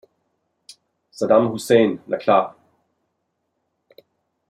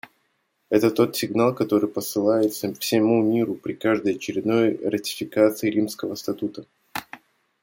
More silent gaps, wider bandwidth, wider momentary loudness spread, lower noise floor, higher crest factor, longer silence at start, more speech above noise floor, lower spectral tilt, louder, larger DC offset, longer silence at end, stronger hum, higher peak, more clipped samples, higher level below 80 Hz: neither; second, 13.5 kHz vs 17 kHz; about the same, 9 LU vs 10 LU; first, -74 dBFS vs -70 dBFS; about the same, 20 dB vs 18 dB; first, 1.2 s vs 0.7 s; first, 57 dB vs 48 dB; about the same, -5.5 dB/octave vs -5.5 dB/octave; first, -19 LUFS vs -23 LUFS; neither; first, 2 s vs 0.45 s; neither; about the same, -2 dBFS vs -4 dBFS; neither; about the same, -68 dBFS vs -68 dBFS